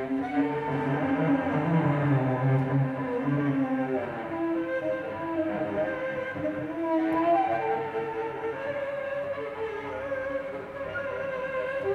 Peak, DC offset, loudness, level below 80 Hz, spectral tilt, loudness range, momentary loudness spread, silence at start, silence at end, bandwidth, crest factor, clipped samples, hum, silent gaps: -14 dBFS; under 0.1%; -29 LUFS; -62 dBFS; -9 dB/octave; 6 LU; 8 LU; 0 s; 0 s; 6.6 kHz; 14 dB; under 0.1%; none; none